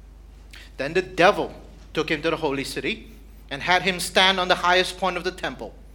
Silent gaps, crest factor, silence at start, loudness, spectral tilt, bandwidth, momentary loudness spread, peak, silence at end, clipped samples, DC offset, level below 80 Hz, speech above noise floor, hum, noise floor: none; 24 dB; 0.05 s; -22 LUFS; -3.5 dB/octave; 19 kHz; 14 LU; 0 dBFS; 0 s; under 0.1%; under 0.1%; -44 dBFS; 22 dB; none; -44 dBFS